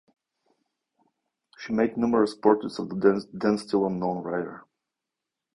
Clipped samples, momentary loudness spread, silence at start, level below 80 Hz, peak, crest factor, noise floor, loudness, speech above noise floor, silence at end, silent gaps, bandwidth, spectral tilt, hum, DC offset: under 0.1%; 9 LU; 1.6 s; -64 dBFS; -6 dBFS; 22 dB; -87 dBFS; -25 LUFS; 62 dB; 0.95 s; none; 10.5 kHz; -7 dB/octave; none; under 0.1%